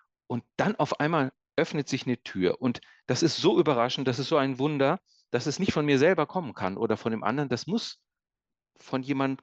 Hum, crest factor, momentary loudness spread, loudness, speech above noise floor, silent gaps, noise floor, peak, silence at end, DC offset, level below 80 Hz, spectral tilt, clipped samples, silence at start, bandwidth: none; 18 dB; 10 LU; -27 LUFS; 45 dB; none; -72 dBFS; -10 dBFS; 0.05 s; under 0.1%; -66 dBFS; -5.5 dB/octave; under 0.1%; 0.3 s; 8.4 kHz